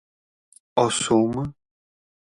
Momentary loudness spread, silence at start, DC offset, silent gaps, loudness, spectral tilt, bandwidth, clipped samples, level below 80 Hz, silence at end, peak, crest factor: 10 LU; 0.75 s; under 0.1%; none; -22 LUFS; -4.5 dB/octave; 11.5 kHz; under 0.1%; -56 dBFS; 0.7 s; -4 dBFS; 20 dB